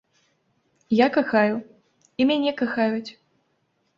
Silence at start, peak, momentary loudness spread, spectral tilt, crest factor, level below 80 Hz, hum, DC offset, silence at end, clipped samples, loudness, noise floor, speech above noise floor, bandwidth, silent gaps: 0.9 s; -6 dBFS; 13 LU; -6.5 dB/octave; 20 dB; -68 dBFS; none; under 0.1%; 0.85 s; under 0.1%; -22 LUFS; -70 dBFS; 49 dB; 7.4 kHz; none